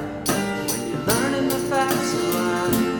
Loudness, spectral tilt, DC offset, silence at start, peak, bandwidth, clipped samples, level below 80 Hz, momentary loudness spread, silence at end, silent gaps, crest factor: -22 LUFS; -4 dB/octave; under 0.1%; 0 s; -4 dBFS; 19.5 kHz; under 0.1%; -48 dBFS; 4 LU; 0 s; none; 18 dB